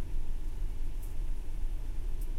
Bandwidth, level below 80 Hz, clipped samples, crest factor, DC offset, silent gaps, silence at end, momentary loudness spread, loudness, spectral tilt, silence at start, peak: 12.5 kHz; -32 dBFS; under 0.1%; 8 dB; under 0.1%; none; 0 s; 1 LU; -42 LUFS; -6 dB/octave; 0 s; -22 dBFS